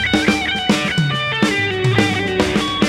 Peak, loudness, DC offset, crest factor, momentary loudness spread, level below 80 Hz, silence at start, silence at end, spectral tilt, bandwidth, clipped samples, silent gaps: -2 dBFS; -16 LUFS; under 0.1%; 16 dB; 2 LU; -38 dBFS; 0 s; 0 s; -4.5 dB/octave; 15.5 kHz; under 0.1%; none